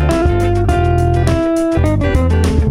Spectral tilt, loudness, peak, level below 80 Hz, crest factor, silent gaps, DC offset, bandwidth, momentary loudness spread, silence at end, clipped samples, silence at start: -7.5 dB/octave; -14 LUFS; -2 dBFS; -18 dBFS; 12 dB; none; under 0.1%; 12.5 kHz; 1 LU; 0 s; under 0.1%; 0 s